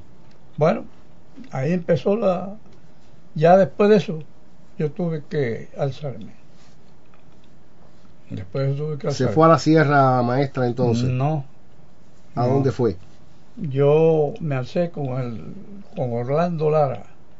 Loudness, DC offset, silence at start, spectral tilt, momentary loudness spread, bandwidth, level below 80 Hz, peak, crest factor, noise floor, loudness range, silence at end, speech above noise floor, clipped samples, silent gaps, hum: -20 LUFS; 2%; 0.6 s; -8 dB/octave; 18 LU; 7.8 kHz; -58 dBFS; -2 dBFS; 20 dB; -52 dBFS; 10 LU; 0.35 s; 32 dB; under 0.1%; none; none